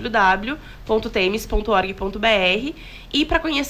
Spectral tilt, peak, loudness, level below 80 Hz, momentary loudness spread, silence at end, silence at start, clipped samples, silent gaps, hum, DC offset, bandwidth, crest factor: -4 dB/octave; -6 dBFS; -20 LUFS; -34 dBFS; 12 LU; 0 s; 0 s; under 0.1%; none; none; under 0.1%; 16 kHz; 14 dB